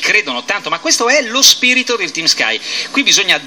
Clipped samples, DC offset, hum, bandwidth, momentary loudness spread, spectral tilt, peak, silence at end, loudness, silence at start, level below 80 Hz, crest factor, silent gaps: 0.2%; 0.2%; none; over 20 kHz; 10 LU; 0.5 dB/octave; 0 dBFS; 0 s; -11 LUFS; 0 s; -64 dBFS; 14 dB; none